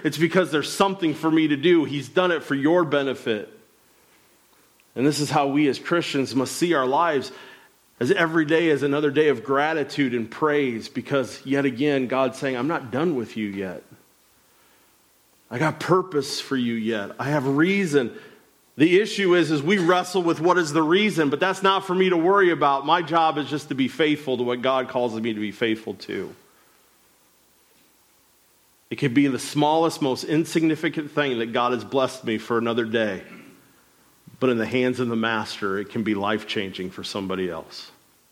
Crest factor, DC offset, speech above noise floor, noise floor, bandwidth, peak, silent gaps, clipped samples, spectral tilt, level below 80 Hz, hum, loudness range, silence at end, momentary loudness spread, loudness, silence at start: 18 dB; under 0.1%; 38 dB; -60 dBFS; 15.5 kHz; -6 dBFS; none; under 0.1%; -5.5 dB/octave; -70 dBFS; none; 8 LU; 0.4 s; 9 LU; -22 LUFS; 0 s